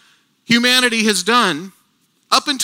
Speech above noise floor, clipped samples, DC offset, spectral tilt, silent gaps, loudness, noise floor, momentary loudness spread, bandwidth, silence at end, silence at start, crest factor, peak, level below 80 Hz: 46 dB; under 0.1%; under 0.1%; -2 dB/octave; none; -14 LUFS; -61 dBFS; 6 LU; 18.5 kHz; 0 s; 0.5 s; 18 dB; 0 dBFS; -66 dBFS